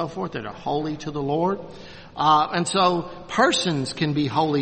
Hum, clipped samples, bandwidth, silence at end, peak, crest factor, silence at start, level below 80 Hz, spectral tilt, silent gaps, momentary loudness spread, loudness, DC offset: none; under 0.1%; 8.8 kHz; 0 s; -6 dBFS; 18 dB; 0 s; -54 dBFS; -4.5 dB/octave; none; 12 LU; -23 LUFS; under 0.1%